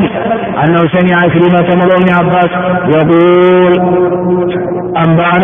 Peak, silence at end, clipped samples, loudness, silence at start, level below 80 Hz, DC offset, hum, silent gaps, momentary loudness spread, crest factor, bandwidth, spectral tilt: 0 dBFS; 0 s; 0.3%; -9 LUFS; 0 s; -42 dBFS; under 0.1%; none; none; 6 LU; 8 dB; 3.7 kHz; -10 dB/octave